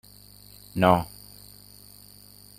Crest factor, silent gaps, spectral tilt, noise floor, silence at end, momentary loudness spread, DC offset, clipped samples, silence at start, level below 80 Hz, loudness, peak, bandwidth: 26 dB; none; -6 dB/octave; -50 dBFS; 1.55 s; 26 LU; under 0.1%; under 0.1%; 0.75 s; -56 dBFS; -23 LUFS; -4 dBFS; 16 kHz